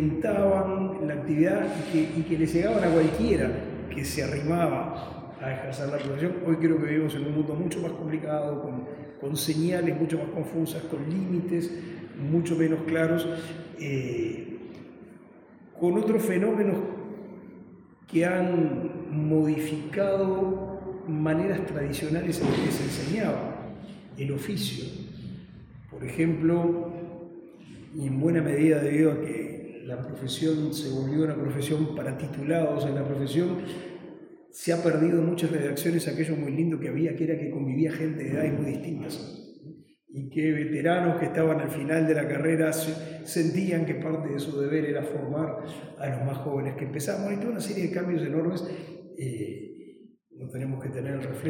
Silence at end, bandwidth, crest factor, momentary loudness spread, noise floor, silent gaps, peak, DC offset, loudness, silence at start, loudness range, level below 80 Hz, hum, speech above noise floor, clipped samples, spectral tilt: 0 s; 17 kHz; 18 dB; 15 LU; -52 dBFS; none; -10 dBFS; under 0.1%; -28 LUFS; 0 s; 5 LU; -56 dBFS; none; 25 dB; under 0.1%; -6.5 dB/octave